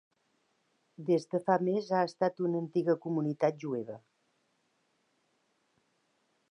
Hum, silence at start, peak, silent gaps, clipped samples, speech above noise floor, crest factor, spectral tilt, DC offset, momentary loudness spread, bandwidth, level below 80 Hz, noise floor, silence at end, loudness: none; 1 s; -12 dBFS; none; under 0.1%; 45 dB; 22 dB; -7.5 dB/octave; under 0.1%; 9 LU; 10.5 kHz; -88 dBFS; -76 dBFS; 2.55 s; -32 LUFS